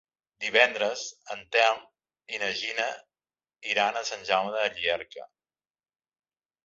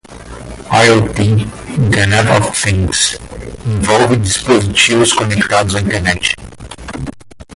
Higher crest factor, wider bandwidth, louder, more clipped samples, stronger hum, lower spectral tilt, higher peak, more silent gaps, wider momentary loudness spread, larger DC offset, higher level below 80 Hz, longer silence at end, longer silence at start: first, 26 dB vs 14 dB; second, 8 kHz vs 11.5 kHz; second, -27 LUFS vs -12 LUFS; neither; neither; second, -1 dB/octave vs -4 dB/octave; second, -4 dBFS vs 0 dBFS; neither; second, 16 LU vs 19 LU; neither; second, -72 dBFS vs -30 dBFS; first, 1.4 s vs 0 s; first, 0.4 s vs 0.1 s